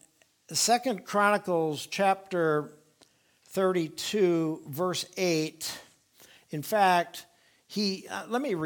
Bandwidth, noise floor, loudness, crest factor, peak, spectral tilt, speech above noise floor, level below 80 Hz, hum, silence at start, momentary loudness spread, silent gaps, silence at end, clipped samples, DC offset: 19.5 kHz; -64 dBFS; -28 LUFS; 20 dB; -10 dBFS; -4 dB/octave; 36 dB; -76 dBFS; none; 0.5 s; 12 LU; none; 0 s; under 0.1%; under 0.1%